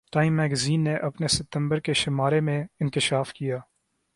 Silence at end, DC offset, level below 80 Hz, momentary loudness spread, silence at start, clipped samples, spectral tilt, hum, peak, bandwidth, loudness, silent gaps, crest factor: 0.55 s; under 0.1%; -54 dBFS; 6 LU; 0.15 s; under 0.1%; -5 dB/octave; none; -8 dBFS; 11.5 kHz; -25 LUFS; none; 16 dB